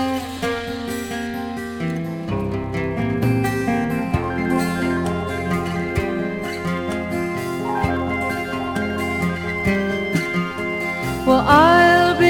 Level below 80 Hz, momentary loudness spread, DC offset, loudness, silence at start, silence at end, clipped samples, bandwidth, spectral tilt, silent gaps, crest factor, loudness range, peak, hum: -42 dBFS; 12 LU; under 0.1%; -21 LUFS; 0 s; 0 s; under 0.1%; over 20 kHz; -6 dB/octave; none; 18 dB; 5 LU; -2 dBFS; none